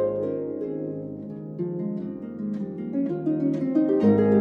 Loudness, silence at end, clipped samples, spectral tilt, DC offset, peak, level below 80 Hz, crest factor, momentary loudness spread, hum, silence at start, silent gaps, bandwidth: -26 LUFS; 0 s; under 0.1%; -11 dB/octave; under 0.1%; -8 dBFS; -66 dBFS; 16 dB; 14 LU; none; 0 s; none; 5 kHz